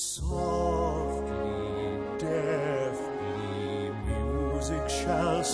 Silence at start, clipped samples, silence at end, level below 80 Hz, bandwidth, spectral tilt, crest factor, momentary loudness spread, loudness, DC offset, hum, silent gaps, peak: 0 s; under 0.1%; 0 s; -38 dBFS; 11 kHz; -5 dB/octave; 16 dB; 5 LU; -31 LUFS; under 0.1%; none; none; -14 dBFS